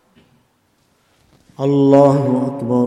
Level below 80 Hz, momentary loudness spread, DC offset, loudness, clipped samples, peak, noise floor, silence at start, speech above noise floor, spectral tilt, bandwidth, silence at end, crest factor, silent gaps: -60 dBFS; 9 LU; under 0.1%; -14 LUFS; under 0.1%; 0 dBFS; -60 dBFS; 1.6 s; 47 dB; -9 dB/octave; 9.2 kHz; 0 s; 16 dB; none